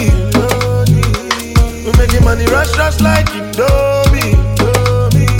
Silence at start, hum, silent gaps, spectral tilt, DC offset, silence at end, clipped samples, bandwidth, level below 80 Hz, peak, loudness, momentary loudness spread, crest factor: 0 s; none; none; -5.5 dB/octave; under 0.1%; 0 s; under 0.1%; 17 kHz; -16 dBFS; 0 dBFS; -12 LUFS; 3 LU; 10 dB